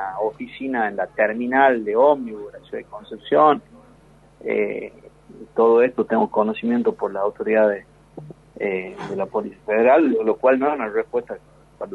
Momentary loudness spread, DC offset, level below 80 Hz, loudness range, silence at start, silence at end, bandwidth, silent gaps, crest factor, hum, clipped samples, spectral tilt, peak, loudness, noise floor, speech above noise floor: 18 LU; under 0.1%; -58 dBFS; 3 LU; 0 s; 0 s; 5.2 kHz; none; 20 dB; none; under 0.1%; -7.5 dB/octave; -2 dBFS; -20 LUFS; -51 dBFS; 31 dB